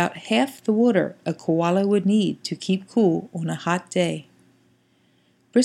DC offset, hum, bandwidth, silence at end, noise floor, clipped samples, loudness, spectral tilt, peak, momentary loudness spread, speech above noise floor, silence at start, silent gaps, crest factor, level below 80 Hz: under 0.1%; none; 13.5 kHz; 0 s; -62 dBFS; under 0.1%; -22 LUFS; -6 dB/octave; -4 dBFS; 8 LU; 40 dB; 0 s; none; 18 dB; -72 dBFS